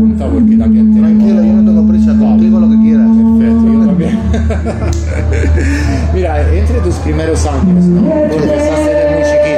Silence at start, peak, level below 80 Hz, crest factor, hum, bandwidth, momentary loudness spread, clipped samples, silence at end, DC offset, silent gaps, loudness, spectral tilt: 0 s; -2 dBFS; -20 dBFS; 6 dB; none; 9.4 kHz; 6 LU; under 0.1%; 0 s; under 0.1%; none; -10 LUFS; -8 dB/octave